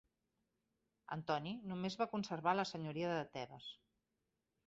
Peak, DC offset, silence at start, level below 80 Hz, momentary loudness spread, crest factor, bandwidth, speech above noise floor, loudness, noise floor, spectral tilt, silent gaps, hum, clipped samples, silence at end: -22 dBFS; under 0.1%; 1.1 s; -78 dBFS; 13 LU; 22 dB; 7.6 kHz; 47 dB; -42 LUFS; -88 dBFS; -4 dB/octave; none; none; under 0.1%; 0.95 s